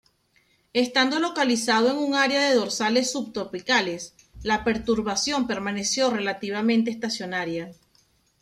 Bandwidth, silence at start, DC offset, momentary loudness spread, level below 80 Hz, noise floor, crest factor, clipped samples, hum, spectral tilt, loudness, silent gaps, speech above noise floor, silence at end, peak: 14 kHz; 0.75 s; under 0.1%; 10 LU; -54 dBFS; -65 dBFS; 16 dB; under 0.1%; none; -3 dB/octave; -24 LUFS; none; 41 dB; 0.7 s; -8 dBFS